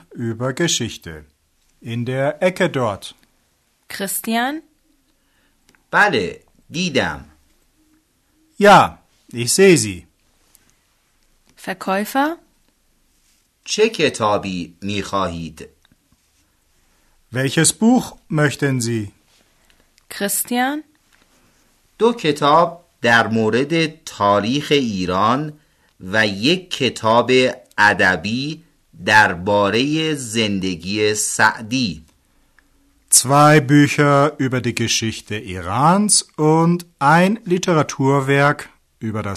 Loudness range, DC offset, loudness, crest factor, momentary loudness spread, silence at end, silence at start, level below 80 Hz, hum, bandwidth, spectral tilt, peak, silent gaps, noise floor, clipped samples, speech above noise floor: 8 LU; under 0.1%; -17 LUFS; 18 dB; 15 LU; 0 s; 0.1 s; -54 dBFS; none; 13.5 kHz; -4 dB/octave; 0 dBFS; none; -63 dBFS; under 0.1%; 46 dB